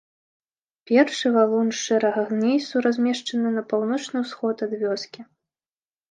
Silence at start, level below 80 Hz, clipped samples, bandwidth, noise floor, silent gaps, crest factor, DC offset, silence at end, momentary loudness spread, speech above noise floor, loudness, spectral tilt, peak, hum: 0.9 s; -78 dBFS; under 0.1%; 9.4 kHz; under -90 dBFS; none; 18 dB; under 0.1%; 0.9 s; 7 LU; over 68 dB; -23 LUFS; -4.5 dB/octave; -6 dBFS; none